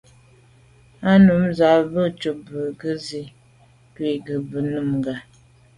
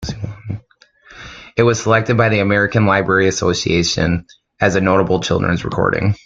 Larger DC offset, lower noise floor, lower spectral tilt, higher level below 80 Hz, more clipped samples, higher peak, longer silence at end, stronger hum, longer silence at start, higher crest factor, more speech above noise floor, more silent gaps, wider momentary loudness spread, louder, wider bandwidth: neither; about the same, -53 dBFS vs -51 dBFS; first, -7.5 dB/octave vs -5 dB/octave; second, -52 dBFS vs -42 dBFS; neither; second, -4 dBFS vs 0 dBFS; first, 0.55 s vs 0.1 s; neither; first, 1 s vs 0 s; about the same, 18 dB vs 16 dB; about the same, 34 dB vs 36 dB; neither; about the same, 15 LU vs 14 LU; second, -20 LUFS vs -16 LUFS; first, 10.5 kHz vs 7.8 kHz